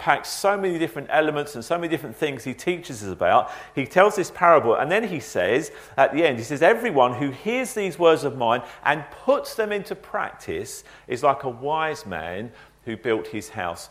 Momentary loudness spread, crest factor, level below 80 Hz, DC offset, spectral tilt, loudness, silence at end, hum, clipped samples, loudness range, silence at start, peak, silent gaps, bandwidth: 12 LU; 22 dB; -58 dBFS; under 0.1%; -4.5 dB/octave; -23 LUFS; 0.05 s; none; under 0.1%; 7 LU; 0 s; 0 dBFS; none; 16 kHz